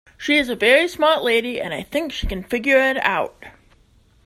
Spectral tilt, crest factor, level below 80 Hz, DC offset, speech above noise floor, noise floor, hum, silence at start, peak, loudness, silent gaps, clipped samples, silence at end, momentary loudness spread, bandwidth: -4 dB/octave; 20 dB; -40 dBFS; under 0.1%; 36 dB; -55 dBFS; none; 0.2 s; -2 dBFS; -19 LUFS; none; under 0.1%; 0.75 s; 11 LU; 16 kHz